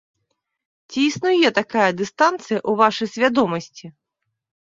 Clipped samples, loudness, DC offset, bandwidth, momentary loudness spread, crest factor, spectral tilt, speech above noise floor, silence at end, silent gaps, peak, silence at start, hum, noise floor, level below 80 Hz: under 0.1%; -19 LUFS; under 0.1%; 7.8 kHz; 7 LU; 20 dB; -4.5 dB/octave; 59 dB; 0.75 s; none; -2 dBFS; 0.9 s; none; -78 dBFS; -64 dBFS